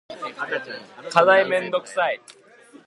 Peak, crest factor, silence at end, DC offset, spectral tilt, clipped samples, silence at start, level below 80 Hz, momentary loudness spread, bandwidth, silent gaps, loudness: 0 dBFS; 22 dB; 0.1 s; under 0.1%; -4 dB/octave; under 0.1%; 0.1 s; -74 dBFS; 18 LU; 11.5 kHz; none; -21 LUFS